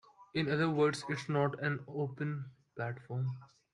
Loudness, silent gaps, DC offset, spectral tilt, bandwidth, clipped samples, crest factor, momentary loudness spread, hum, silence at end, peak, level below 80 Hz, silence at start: -35 LUFS; none; under 0.1%; -6.5 dB/octave; 11.5 kHz; under 0.1%; 18 dB; 11 LU; none; 0.3 s; -18 dBFS; -72 dBFS; 0.2 s